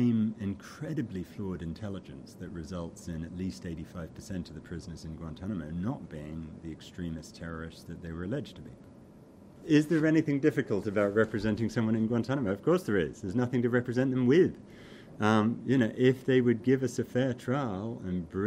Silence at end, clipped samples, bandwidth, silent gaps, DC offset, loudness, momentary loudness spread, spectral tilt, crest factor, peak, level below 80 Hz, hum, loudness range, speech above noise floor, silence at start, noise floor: 0 s; under 0.1%; 15 kHz; none; under 0.1%; -30 LUFS; 17 LU; -7.5 dB/octave; 20 dB; -12 dBFS; -56 dBFS; none; 13 LU; 23 dB; 0 s; -53 dBFS